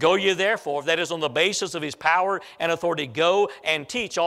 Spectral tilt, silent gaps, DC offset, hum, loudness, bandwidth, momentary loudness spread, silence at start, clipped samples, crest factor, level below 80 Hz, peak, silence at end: -3 dB/octave; none; under 0.1%; none; -23 LUFS; 14 kHz; 6 LU; 0 s; under 0.1%; 18 dB; -64 dBFS; -6 dBFS; 0 s